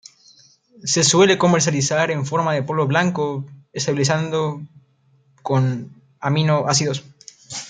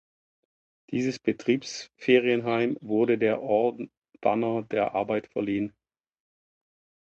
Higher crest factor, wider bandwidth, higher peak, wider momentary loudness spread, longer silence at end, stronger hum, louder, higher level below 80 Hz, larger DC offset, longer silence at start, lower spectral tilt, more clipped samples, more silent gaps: about the same, 18 dB vs 20 dB; first, 9.6 kHz vs 8.2 kHz; first, -2 dBFS vs -8 dBFS; first, 16 LU vs 10 LU; second, 0 s vs 1.35 s; neither; first, -19 LUFS vs -26 LUFS; first, -60 dBFS vs -68 dBFS; neither; about the same, 0.85 s vs 0.9 s; second, -4 dB/octave vs -6 dB/octave; neither; neither